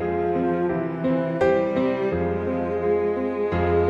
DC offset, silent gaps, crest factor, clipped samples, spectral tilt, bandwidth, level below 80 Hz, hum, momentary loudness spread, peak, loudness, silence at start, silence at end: under 0.1%; none; 14 dB; under 0.1%; -9 dB/octave; 7.2 kHz; -44 dBFS; none; 4 LU; -8 dBFS; -23 LUFS; 0 s; 0 s